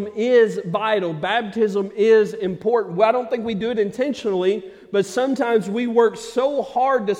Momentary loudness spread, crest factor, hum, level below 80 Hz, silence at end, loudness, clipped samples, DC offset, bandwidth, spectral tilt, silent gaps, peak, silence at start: 7 LU; 16 dB; none; -62 dBFS; 0 s; -20 LUFS; under 0.1%; under 0.1%; 11.5 kHz; -5.5 dB/octave; none; -4 dBFS; 0 s